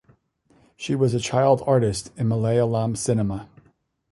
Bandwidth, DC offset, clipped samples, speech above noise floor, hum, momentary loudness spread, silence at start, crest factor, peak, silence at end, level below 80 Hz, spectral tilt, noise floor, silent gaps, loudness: 11.5 kHz; under 0.1%; under 0.1%; 41 dB; none; 9 LU; 0.8 s; 18 dB; -4 dBFS; 0.7 s; -50 dBFS; -6.5 dB/octave; -62 dBFS; none; -22 LUFS